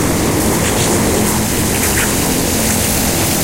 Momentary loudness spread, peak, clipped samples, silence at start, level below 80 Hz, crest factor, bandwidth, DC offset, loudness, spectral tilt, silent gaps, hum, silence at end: 1 LU; -2 dBFS; under 0.1%; 0 s; -28 dBFS; 12 dB; 16 kHz; under 0.1%; -13 LUFS; -3.5 dB/octave; none; none; 0 s